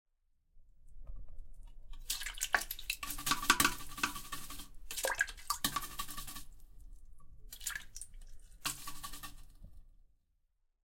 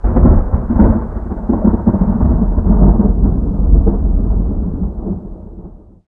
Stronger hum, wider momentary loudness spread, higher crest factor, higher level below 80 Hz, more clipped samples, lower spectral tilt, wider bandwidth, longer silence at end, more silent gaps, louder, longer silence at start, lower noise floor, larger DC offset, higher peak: neither; first, 23 LU vs 12 LU; first, 30 dB vs 12 dB; second, -52 dBFS vs -14 dBFS; neither; second, -1 dB/octave vs -14 dB/octave; first, 17 kHz vs 2.1 kHz; first, 1.05 s vs 0.3 s; neither; second, -37 LUFS vs -15 LUFS; first, 0.55 s vs 0 s; first, -77 dBFS vs -34 dBFS; neither; second, -10 dBFS vs 0 dBFS